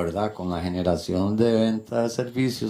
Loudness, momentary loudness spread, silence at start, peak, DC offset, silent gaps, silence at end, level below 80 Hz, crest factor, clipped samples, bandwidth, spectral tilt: -24 LUFS; 7 LU; 0 s; -8 dBFS; under 0.1%; none; 0 s; -50 dBFS; 16 dB; under 0.1%; 15.5 kHz; -6.5 dB/octave